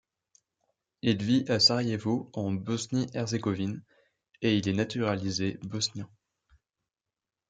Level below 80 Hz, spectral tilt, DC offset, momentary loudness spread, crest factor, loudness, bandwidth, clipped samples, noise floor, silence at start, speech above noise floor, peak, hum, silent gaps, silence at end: -68 dBFS; -5 dB/octave; under 0.1%; 11 LU; 20 dB; -29 LUFS; 9.4 kHz; under 0.1%; under -90 dBFS; 1.05 s; over 61 dB; -10 dBFS; none; none; 1.45 s